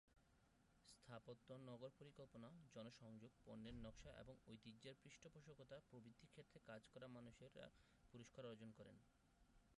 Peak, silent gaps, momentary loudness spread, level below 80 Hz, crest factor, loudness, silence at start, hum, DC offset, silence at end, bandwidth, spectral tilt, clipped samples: -46 dBFS; none; 7 LU; -76 dBFS; 16 dB; -63 LUFS; 0.05 s; none; under 0.1%; 0.05 s; 11 kHz; -5.5 dB/octave; under 0.1%